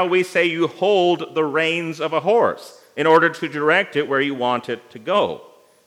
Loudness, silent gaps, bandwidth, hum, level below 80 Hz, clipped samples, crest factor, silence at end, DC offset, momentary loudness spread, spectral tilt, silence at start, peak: -19 LUFS; none; 14 kHz; none; -76 dBFS; under 0.1%; 18 dB; 0.45 s; under 0.1%; 9 LU; -5 dB/octave; 0 s; 0 dBFS